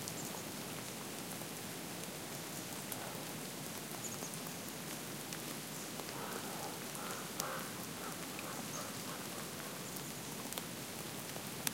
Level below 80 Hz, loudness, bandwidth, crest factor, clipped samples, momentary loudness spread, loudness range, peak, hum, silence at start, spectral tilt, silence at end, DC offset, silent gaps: -74 dBFS; -43 LUFS; 17 kHz; 34 dB; under 0.1%; 2 LU; 1 LU; -12 dBFS; none; 0 s; -2.5 dB/octave; 0 s; under 0.1%; none